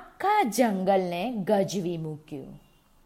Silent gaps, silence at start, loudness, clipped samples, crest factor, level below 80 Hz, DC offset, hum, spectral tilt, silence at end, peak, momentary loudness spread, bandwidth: none; 0 s; -26 LUFS; under 0.1%; 18 dB; -62 dBFS; under 0.1%; none; -5.5 dB/octave; 0.5 s; -10 dBFS; 17 LU; 16 kHz